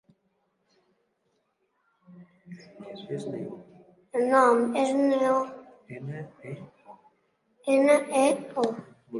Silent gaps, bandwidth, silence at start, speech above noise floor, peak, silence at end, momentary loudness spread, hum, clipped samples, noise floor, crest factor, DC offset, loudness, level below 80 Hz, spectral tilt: none; 11.5 kHz; 2.15 s; 49 dB; -8 dBFS; 0 s; 22 LU; none; under 0.1%; -74 dBFS; 20 dB; under 0.1%; -25 LUFS; -78 dBFS; -5.5 dB/octave